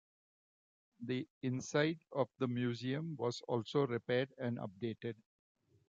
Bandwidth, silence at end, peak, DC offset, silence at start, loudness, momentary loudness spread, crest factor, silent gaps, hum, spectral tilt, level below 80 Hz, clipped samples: 7.8 kHz; 0.75 s; -20 dBFS; under 0.1%; 1 s; -39 LUFS; 8 LU; 20 dB; 1.30-1.41 s; none; -6 dB/octave; -78 dBFS; under 0.1%